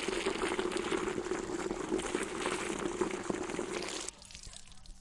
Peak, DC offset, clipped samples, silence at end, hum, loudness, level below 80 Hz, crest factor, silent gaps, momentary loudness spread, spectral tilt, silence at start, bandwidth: -16 dBFS; under 0.1%; under 0.1%; 0 s; none; -36 LUFS; -56 dBFS; 20 dB; none; 14 LU; -3.5 dB/octave; 0 s; 11.5 kHz